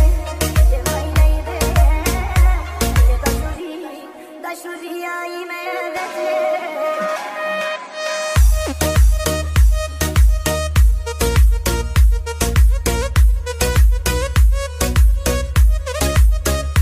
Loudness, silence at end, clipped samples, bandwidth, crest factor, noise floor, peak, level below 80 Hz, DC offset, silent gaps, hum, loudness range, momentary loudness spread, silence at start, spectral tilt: -18 LUFS; 0 s; under 0.1%; 16 kHz; 12 dB; -35 dBFS; -2 dBFS; -16 dBFS; under 0.1%; none; none; 6 LU; 10 LU; 0 s; -5 dB/octave